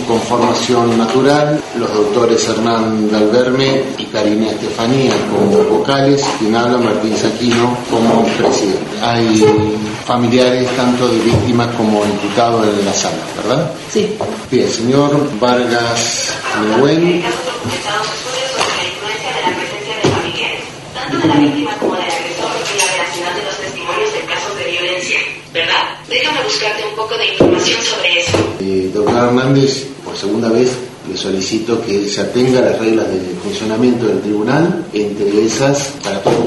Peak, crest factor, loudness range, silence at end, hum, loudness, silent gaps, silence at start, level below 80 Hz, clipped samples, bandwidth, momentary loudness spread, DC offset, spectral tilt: 0 dBFS; 14 dB; 3 LU; 0 s; none; -14 LUFS; none; 0 s; -48 dBFS; under 0.1%; 11.5 kHz; 7 LU; under 0.1%; -4.5 dB/octave